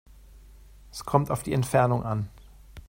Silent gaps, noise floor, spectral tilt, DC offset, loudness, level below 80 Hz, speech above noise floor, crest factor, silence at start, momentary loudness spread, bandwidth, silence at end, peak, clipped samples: none; -50 dBFS; -6.5 dB/octave; under 0.1%; -26 LUFS; -50 dBFS; 25 dB; 24 dB; 0.35 s; 16 LU; 16.5 kHz; 0.05 s; -4 dBFS; under 0.1%